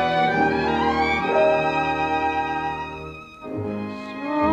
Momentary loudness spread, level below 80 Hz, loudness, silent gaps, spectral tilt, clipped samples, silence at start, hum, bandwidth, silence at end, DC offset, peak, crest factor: 14 LU; -46 dBFS; -22 LUFS; none; -6 dB/octave; under 0.1%; 0 s; none; 8.8 kHz; 0 s; under 0.1%; -8 dBFS; 14 dB